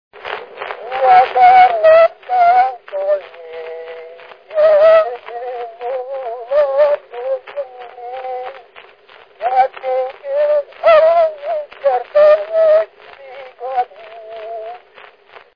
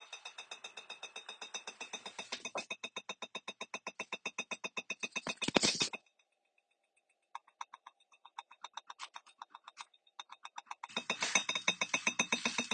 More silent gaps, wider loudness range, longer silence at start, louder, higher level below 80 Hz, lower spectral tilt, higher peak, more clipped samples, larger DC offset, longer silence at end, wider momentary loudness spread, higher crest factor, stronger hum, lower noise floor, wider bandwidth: neither; second, 8 LU vs 15 LU; first, 0.15 s vs 0 s; first, -14 LUFS vs -37 LUFS; first, -60 dBFS vs -80 dBFS; first, -4 dB/octave vs -1 dB/octave; first, 0 dBFS vs -6 dBFS; neither; first, 0.1% vs under 0.1%; first, 0.8 s vs 0 s; about the same, 21 LU vs 21 LU; second, 16 dB vs 36 dB; neither; second, -44 dBFS vs -80 dBFS; second, 5.2 kHz vs 9.6 kHz